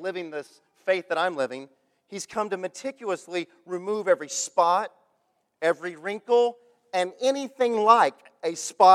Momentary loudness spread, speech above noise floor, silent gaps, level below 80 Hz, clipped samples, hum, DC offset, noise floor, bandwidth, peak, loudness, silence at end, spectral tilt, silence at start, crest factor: 15 LU; 48 dB; none; -82 dBFS; under 0.1%; none; under 0.1%; -72 dBFS; 14 kHz; -4 dBFS; -26 LUFS; 0 s; -3 dB/octave; 0 s; 22 dB